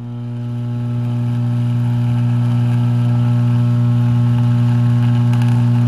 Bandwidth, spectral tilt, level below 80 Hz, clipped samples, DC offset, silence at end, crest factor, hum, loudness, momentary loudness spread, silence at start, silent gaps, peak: 4.9 kHz; -9 dB/octave; -44 dBFS; under 0.1%; 0.2%; 0 s; 8 dB; 60 Hz at -15 dBFS; -16 LUFS; 7 LU; 0 s; none; -6 dBFS